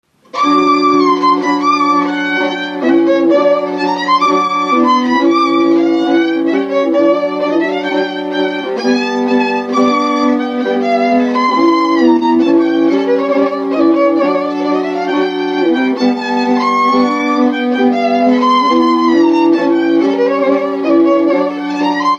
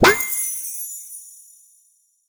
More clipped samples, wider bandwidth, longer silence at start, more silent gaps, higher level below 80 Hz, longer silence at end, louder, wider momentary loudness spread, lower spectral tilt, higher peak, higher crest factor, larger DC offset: neither; second, 7.4 kHz vs over 20 kHz; first, 0.35 s vs 0 s; neither; second, -62 dBFS vs -50 dBFS; second, 0 s vs 0.95 s; first, -12 LUFS vs -21 LUFS; second, 5 LU vs 22 LU; first, -5 dB/octave vs -2.5 dB/octave; about the same, 0 dBFS vs 0 dBFS; second, 12 dB vs 22 dB; neither